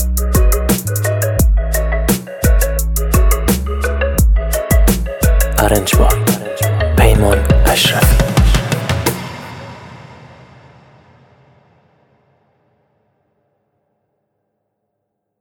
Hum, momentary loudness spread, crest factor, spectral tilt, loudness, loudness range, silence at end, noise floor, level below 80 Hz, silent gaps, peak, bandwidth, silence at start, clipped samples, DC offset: none; 7 LU; 14 dB; -5 dB/octave; -14 LUFS; 7 LU; 5.25 s; -73 dBFS; -16 dBFS; none; 0 dBFS; 18 kHz; 0 s; under 0.1%; under 0.1%